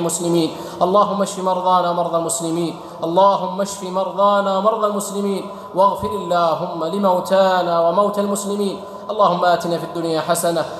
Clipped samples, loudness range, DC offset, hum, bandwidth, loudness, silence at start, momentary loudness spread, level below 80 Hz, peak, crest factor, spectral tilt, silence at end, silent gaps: under 0.1%; 1 LU; under 0.1%; none; 15 kHz; -18 LUFS; 0 s; 8 LU; -58 dBFS; -4 dBFS; 14 dB; -4.5 dB/octave; 0 s; none